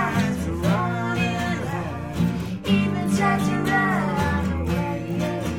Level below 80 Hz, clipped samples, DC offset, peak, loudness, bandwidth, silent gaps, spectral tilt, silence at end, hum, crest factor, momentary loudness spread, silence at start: -40 dBFS; under 0.1%; under 0.1%; -8 dBFS; -23 LUFS; 16.5 kHz; none; -6.5 dB/octave; 0 s; none; 14 dB; 6 LU; 0 s